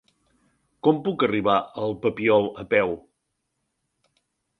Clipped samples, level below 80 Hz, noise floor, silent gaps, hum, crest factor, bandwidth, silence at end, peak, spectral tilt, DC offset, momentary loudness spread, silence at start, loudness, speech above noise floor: under 0.1%; -60 dBFS; -77 dBFS; none; none; 22 dB; 4.8 kHz; 1.6 s; -4 dBFS; -8 dB/octave; under 0.1%; 7 LU; 0.85 s; -23 LUFS; 55 dB